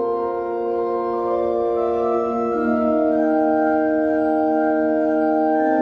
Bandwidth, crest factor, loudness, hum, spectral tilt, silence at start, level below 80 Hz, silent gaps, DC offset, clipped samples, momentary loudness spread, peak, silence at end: 5.2 kHz; 12 dB; -20 LUFS; none; -8.5 dB/octave; 0 s; -52 dBFS; none; under 0.1%; under 0.1%; 4 LU; -8 dBFS; 0 s